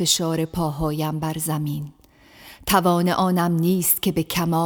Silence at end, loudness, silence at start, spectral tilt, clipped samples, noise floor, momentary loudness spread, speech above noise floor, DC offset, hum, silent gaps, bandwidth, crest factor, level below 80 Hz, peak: 0 s; -21 LUFS; 0 s; -4.5 dB/octave; under 0.1%; -48 dBFS; 8 LU; 27 dB; under 0.1%; none; none; over 20 kHz; 18 dB; -46 dBFS; -4 dBFS